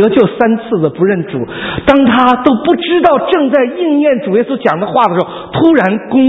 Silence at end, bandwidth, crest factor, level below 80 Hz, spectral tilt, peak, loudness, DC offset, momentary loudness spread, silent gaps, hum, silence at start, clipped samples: 0 s; 6 kHz; 10 dB; -42 dBFS; -8.5 dB/octave; 0 dBFS; -11 LUFS; under 0.1%; 7 LU; none; none; 0 s; 0.3%